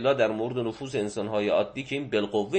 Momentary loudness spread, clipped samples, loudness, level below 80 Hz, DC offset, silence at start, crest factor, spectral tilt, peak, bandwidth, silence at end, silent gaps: 6 LU; under 0.1%; -28 LUFS; -62 dBFS; under 0.1%; 0 s; 16 dB; -5.5 dB/octave; -10 dBFS; 8.8 kHz; 0 s; none